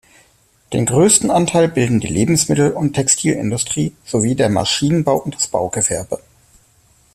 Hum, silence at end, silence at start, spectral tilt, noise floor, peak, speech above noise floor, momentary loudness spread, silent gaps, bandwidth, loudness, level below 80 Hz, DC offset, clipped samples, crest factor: none; 0.95 s; 0.7 s; -4.5 dB/octave; -55 dBFS; 0 dBFS; 39 dB; 8 LU; none; 14.5 kHz; -16 LUFS; -46 dBFS; under 0.1%; under 0.1%; 16 dB